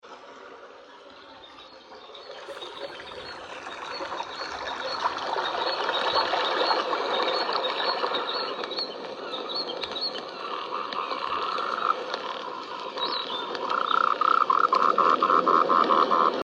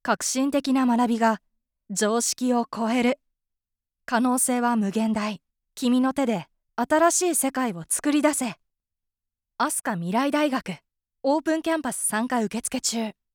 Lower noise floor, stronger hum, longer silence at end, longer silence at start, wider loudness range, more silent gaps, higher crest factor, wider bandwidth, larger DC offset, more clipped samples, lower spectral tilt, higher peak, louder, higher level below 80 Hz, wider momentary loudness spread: second, -48 dBFS vs -85 dBFS; neither; second, 0 s vs 0.25 s; about the same, 0.05 s vs 0.05 s; first, 15 LU vs 3 LU; neither; about the same, 20 dB vs 16 dB; second, 10 kHz vs 19 kHz; neither; neither; about the same, -3 dB/octave vs -3.5 dB/octave; about the same, -8 dBFS vs -8 dBFS; about the same, -26 LUFS vs -24 LUFS; about the same, -70 dBFS vs -66 dBFS; first, 23 LU vs 10 LU